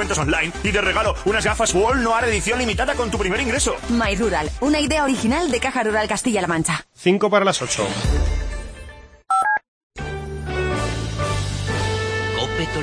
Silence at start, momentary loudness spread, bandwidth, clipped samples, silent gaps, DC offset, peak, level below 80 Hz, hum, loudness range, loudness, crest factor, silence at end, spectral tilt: 0 s; 7 LU; 10.5 kHz; under 0.1%; 9.68-9.90 s; under 0.1%; -4 dBFS; -30 dBFS; none; 5 LU; -20 LUFS; 16 dB; 0 s; -4 dB/octave